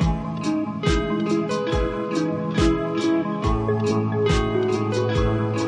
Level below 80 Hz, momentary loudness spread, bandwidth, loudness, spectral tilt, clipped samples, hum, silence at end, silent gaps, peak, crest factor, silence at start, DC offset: -32 dBFS; 3 LU; 11 kHz; -23 LUFS; -6.5 dB/octave; under 0.1%; none; 0 s; none; -6 dBFS; 16 dB; 0 s; under 0.1%